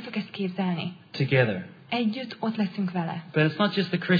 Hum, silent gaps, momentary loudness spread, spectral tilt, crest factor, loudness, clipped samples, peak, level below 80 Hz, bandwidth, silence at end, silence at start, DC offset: none; none; 9 LU; -8 dB/octave; 20 dB; -27 LUFS; under 0.1%; -6 dBFS; -70 dBFS; 5 kHz; 0 s; 0 s; under 0.1%